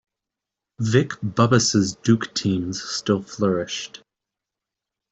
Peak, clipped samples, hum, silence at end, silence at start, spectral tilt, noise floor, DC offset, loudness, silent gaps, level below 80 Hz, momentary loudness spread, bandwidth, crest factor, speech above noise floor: -4 dBFS; under 0.1%; none; 1.25 s; 0.8 s; -5 dB/octave; -86 dBFS; under 0.1%; -22 LUFS; none; -58 dBFS; 10 LU; 8.2 kHz; 20 dB; 65 dB